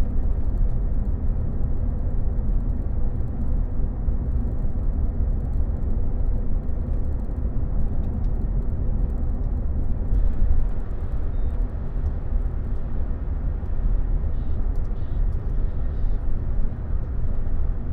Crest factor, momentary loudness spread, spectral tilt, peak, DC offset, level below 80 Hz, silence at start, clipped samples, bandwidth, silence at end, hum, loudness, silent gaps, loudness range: 12 dB; 3 LU; -11 dB/octave; -8 dBFS; under 0.1%; -22 dBFS; 0 s; under 0.1%; 2.1 kHz; 0 s; none; -28 LUFS; none; 2 LU